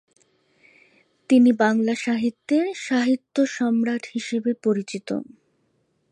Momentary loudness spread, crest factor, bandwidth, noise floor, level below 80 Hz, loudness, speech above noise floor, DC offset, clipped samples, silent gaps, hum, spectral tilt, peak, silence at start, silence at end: 11 LU; 18 dB; 10 kHz; -68 dBFS; -74 dBFS; -22 LUFS; 47 dB; under 0.1%; under 0.1%; none; none; -5 dB/octave; -6 dBFS; 1.3 s; 0.9 s